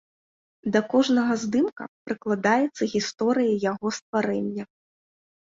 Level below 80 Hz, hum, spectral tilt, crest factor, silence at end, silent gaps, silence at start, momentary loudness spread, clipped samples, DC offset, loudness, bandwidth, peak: -66 dBFS; none; -5 dB/octave; 18 dB; 0.75 s; 1.72-1.76 s, 1.88-2.06 s, 4.02-4.13 s; 0.65 s; 11 LU; under 0.1%; under 0.1%; -25 LUFS; 7.8 kHz; -8 dBFS